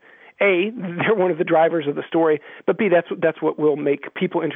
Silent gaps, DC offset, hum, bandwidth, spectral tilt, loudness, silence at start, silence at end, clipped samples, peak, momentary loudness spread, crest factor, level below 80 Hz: none; under 0.1%; none; 3.9 kHz; -10 dB/octave; -20 LUFS; 0.4 s; 0 s; under 0.1%; -4 dBFS; 6 LU; 16 dB; -74 dBFS